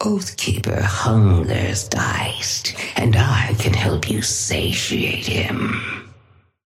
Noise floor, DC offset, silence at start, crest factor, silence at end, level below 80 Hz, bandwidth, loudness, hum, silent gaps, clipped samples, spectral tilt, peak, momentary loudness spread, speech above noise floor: -53 dBFS; under 0.1%; 0 s; 16 dB; 0.55 s; -38 dBFS; 15.5 kHz; -19 LUFS; none; none; under 0.1%; -4.5 dB/octave; -4 dBFS; 6 LU; 34 dB